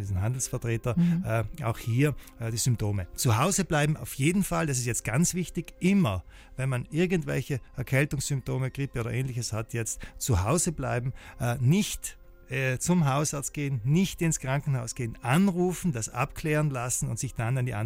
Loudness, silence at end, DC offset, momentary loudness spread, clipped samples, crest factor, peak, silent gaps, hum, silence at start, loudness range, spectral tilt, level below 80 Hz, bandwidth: -28 LUFS; 0 s; under 0.1%; 8 LU; under 0.1%; 16 dB; -12 dBFS; none; none; 0 s; 3 LU; -5 dB/octave; -46 dBFS; 16 kHz